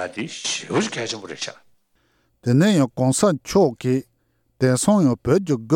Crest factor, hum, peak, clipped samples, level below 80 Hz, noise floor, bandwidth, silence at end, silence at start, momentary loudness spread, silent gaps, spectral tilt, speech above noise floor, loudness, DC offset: 16 dB; none; -6 dBFS; under 0.1%; -54 dBFS; -66 dBFS; 16.5 kHz; 0 s; 0 s; 12 LU; none; -5.5 dB/octave; 47 dB; -20 LUFS; under 0.1%